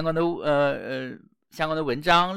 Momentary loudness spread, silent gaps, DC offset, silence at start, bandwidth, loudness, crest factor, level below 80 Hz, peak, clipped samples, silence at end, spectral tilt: 12 LU; none; under 0.1%; 0 s; 15 kHz; -25 LUFS; 20 dB; -52 dBFS; -4 dBFS; under 0.1%; 0 s; -5.5 dB/octave